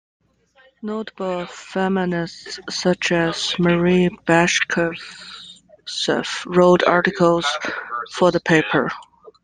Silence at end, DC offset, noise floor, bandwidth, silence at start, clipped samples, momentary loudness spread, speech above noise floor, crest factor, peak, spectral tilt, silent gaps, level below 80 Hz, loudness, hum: 0.15 s; under 0.1%; -56 dBFS; 9.8 kHz; 0.85 s; under 0.1%; 16 LU; 36 dB; 18 dB; -2 dBFS; -5 dB/octave; none; -54 dBFS; -19 LUFS; none